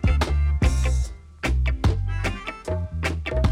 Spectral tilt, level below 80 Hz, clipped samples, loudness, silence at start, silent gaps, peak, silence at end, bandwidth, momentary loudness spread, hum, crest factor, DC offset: -6 dB/octave; -24 dBFS; under 0.1%; -25 LUFS; 0 s; none; -8 dBFS; 0 s; 11.5 kHz; 8 LU; none; 14 dB; under 0.1%